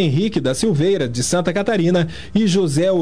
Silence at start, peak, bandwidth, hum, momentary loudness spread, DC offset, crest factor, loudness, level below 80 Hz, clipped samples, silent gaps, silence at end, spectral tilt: 0 s; -4 dBFS; 11 kHz; none; 3 LU; 2%; 12 dB; -18 LUFS; -44 dBFS; under 0.1%; none; 0 s; -5.5 dB/octave